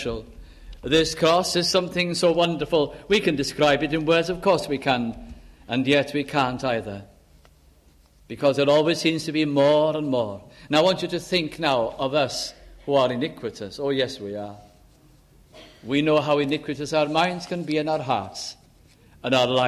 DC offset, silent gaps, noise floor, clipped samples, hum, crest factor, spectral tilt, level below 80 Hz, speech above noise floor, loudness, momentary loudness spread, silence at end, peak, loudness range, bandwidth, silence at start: under 0.1%; none; -55 dBFS; under 0.1%; none; 18 dB; -4.5 dB/octave; -50 dBFS; 33 dB; -23 LUFS; 14 LU; 0 s; -6 dBFS; 5 LU; 14 kHz; 0 s